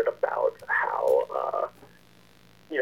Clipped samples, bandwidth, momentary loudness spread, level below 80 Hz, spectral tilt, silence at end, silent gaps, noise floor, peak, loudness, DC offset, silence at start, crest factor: under 0.1%; 16.5 kHz; 8 LU; -70 dBFS; -4.5 dB/octave; 0 s; none; -57 dBFS; -12 dBFS; -27 LUFS; 0.1%; 0 s; 16 dB